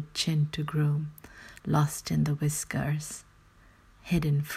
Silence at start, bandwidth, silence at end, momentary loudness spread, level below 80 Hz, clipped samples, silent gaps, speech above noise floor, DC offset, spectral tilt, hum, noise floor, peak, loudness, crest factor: 0 s; 15 kHz; 0 s; 15 LU; -52 dBFS; under 0.1%; none; 30 dB; under 0.1%; -5.5 dB/octave; none; -58 dBFS; -12 dBFS; -29 LUFS; 18 dB